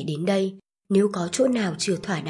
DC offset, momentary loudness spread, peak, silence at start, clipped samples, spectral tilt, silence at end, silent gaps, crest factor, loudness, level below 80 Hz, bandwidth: under 0.1%; 4 LU; -8 dBFS; 0 s; under 0.1%; -5 dB/octave; 0 s; none; 16 dB; -24 LUFS; -64 dBFS; 11.5 kHz